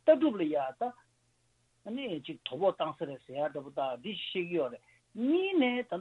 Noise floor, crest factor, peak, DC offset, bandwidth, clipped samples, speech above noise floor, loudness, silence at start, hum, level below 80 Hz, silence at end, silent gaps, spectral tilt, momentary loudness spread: -72 dBFS; 20 dB; -12 dBFS; under 0.1%; 4.3 kHz; under 0.1%; 40 dB; -33 LUFS; 0.05 s; none; -78 dBFS; 0 s; none; -7 dB/octave; 12 LU